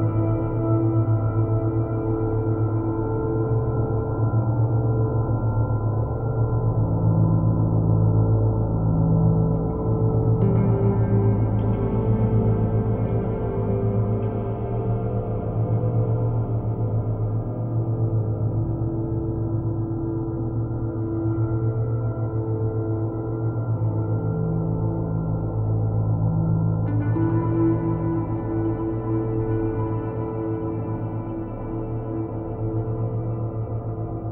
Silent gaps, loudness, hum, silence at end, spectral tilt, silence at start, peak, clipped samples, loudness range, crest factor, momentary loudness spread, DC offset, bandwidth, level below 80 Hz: none; -24 LUFS; none; 0 s; -15 dB/octave; 0 s; -8 dBFS; under 0.1%; 5 LU; 14 dB; 7 LU; under 0.1%; 2.5 kHz; -36 dBFS